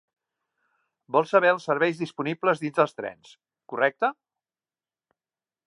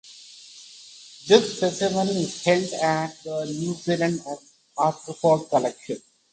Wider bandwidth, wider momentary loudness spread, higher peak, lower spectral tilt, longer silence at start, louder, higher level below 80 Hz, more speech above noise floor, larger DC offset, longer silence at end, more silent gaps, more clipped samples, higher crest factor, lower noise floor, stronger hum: first, 11 kHz vs 9.4 kHz; second, 10 LU vs 24 LU; second, -6 dBFS vs 0 dBFS; first, -6 dB/octave vs -4.5 dB/octave; first, 1.1 s vs 0.05 s; about the same, -24 LUFS vs -23 LUFS; second, -82 dBFS vs -66 dBFS; first, over 65 dB vs 23 dB; neither; first, 1.55 s vs 0.35 s; neither; neither; about the same, 22 dB vs 24 dB; first, under -90 dBFS vs -46 dBFS; neither